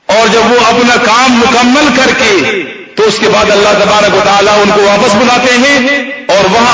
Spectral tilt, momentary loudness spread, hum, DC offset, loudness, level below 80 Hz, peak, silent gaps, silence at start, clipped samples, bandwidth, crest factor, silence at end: -3 dB/octave; 5 LU; none; under 0.1%; -6 LUFS; -38 dBFS; 0 dBFS; none; 0.1 s; 0.7%; 8 kHz; 6 dB; 0 s